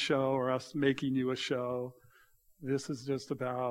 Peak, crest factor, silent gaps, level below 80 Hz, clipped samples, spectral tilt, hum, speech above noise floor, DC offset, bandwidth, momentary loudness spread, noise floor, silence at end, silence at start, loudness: -16 dBFS; 18 dB; none; -70 dBFS; under 0.1%; -5.5 dB/octave; none; 32 dB; under 0.1%; 15 kHz; 7 LU; -65 dBFS; 0 s; 0 s; -34 LUFS